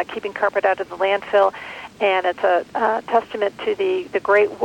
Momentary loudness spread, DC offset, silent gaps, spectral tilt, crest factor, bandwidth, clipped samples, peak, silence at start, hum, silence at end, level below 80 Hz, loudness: 6 LU; under 0.1%; none; -4.5 dB/octave; 14 dB; 16.5 kHz; under 0.1%; -6 dBFS; 0 s; none; 0 s; -62 dBFS; -20 LUFS